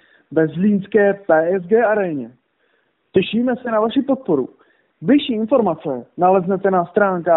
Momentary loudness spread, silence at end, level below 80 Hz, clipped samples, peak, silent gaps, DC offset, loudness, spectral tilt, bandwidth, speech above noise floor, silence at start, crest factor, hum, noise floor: 8 LU; 0 s; -60 dBFS; under 0.1%; -2 dBFS; none; under 0.1%; -18 LUFS; -5.5 dB/octave; 4.1 kHz; 47 dB; 0.3 s; 16 dB; none; -64 dBFS